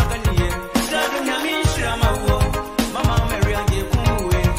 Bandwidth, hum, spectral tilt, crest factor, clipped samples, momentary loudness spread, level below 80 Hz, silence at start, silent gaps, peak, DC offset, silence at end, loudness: 16 kHz; none; -5 dB/octave; 16 dB; under 0.1%; 2 LU; -24 dBFS; 0 s; none; -4 dBFS; under 0.1%; 0 s; -20 LUFS